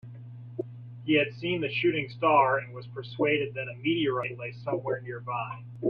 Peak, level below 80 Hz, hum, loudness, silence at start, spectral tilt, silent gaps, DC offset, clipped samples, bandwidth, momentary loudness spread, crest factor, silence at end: -10 dBFS; -68 dBFS; none; -28 LUFS; 0.05 s; -8.5 dB/octave; none; under 0.1%; under 0.1%; 5.6 kHz; 16 LU; 20 dB; 0 s